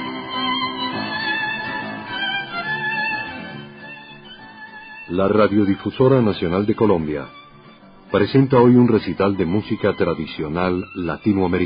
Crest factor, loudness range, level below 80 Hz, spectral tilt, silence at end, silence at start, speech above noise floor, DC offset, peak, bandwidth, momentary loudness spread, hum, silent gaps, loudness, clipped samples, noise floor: 18 dB; 7 LU; -46 dBFS; -11.5 dB/octave; 0 s; 0 s; 28 dB; under 0.1%; -2 dBFS; 5.2 kHz; 20 LU; none; none; -19 LUFS; under 0.1%; -45 dBFS